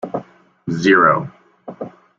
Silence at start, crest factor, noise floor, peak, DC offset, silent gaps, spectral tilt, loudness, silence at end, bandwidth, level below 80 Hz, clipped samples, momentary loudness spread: 0.05 s; 18 dB; -40 dBFS; -2 dBFS; under 0.1%; none; -6 dB/octave; -15 LUFS; 0.3 s; 7.6 kHz; -58 dBFS; under 0.1%; 22 LU